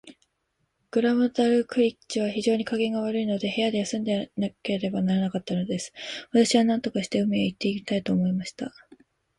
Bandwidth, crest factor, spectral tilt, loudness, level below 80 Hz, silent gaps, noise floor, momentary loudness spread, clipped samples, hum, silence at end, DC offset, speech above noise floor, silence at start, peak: 11.5 kHz; 18 dB; -5.5 dB/octave; -26 LUFS; -64 dBFS; none; -75 dBFS; 9 LU; under 0.1%; none; 0.7 s; under 0.1%; 50 dB; 0.05 s; -8 dBFS